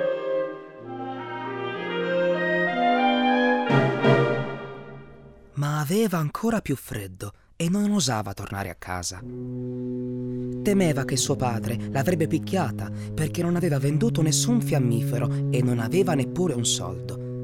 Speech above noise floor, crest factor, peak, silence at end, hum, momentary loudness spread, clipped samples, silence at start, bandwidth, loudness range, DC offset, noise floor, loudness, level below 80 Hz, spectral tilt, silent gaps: 23 dB; 18 dB; -6 dBFS; 0 s; none; 13 LU; under 0.1%; 0 s; 16.5 kHz; 6 LU; under 0.1%; -47 dBFS; -25 LUFS; -52 dBFS; -5 dB/octave; none